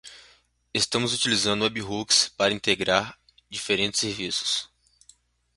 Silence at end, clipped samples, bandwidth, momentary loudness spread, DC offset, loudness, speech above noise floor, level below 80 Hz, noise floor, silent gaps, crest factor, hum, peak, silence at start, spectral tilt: 0.9 s; under 0.1%; 11.5 kHz; 11 LU; under 0.1%; -24 LUFS; 34 dB; -58 dBFS; -59 dBFS; none; 24 dB; 60 Hz at -60 dBFS; -4 dBFS; 0.05 s; -2 dB/octave